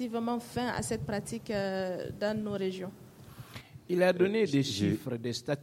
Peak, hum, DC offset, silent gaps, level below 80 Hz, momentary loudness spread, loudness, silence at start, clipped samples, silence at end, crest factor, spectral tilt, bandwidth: -14 dBFS; none; under 0.1%; none; -60 dBFS; 20 LU; -32 LUFS; 0 s; under 0.1%; 0 s; 18 dB; -5.5 dB/octave; 16.5 kHz